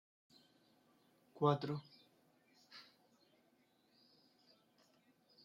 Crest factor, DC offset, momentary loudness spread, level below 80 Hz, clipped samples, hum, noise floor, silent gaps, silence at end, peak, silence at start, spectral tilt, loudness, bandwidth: 26 dB; under 0.1%; 23 LU; -90 dBFS; under 0.1%; none; -76 dBFS; none; 2.65 s; -22 dBFS; 1.35 s; -8 dB/octave; -39 LUFS; 7.4 kHz